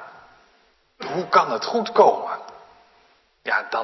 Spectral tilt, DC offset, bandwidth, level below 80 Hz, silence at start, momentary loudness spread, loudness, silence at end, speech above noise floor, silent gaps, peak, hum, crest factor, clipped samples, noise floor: -4.5 dB/octave; under 0.1%; 6.2 kHz; -70 dBFS; 0 s; 17 LU; -21 LUFS; 0 s; 40 dB; none; -2 dBFS; none; 22 dB; under 0.1%; -61 dBFS